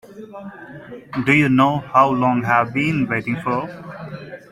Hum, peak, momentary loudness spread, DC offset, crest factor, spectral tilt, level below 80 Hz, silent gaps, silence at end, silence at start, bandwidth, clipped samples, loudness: none; -2 dBFS; 21 LU; under 0.1%; 18 dB; -7 dB/octave; -54 dBFS; none; 0.1 s; 0.1 s; 15 kHz; under 0.1%; -18 LUFS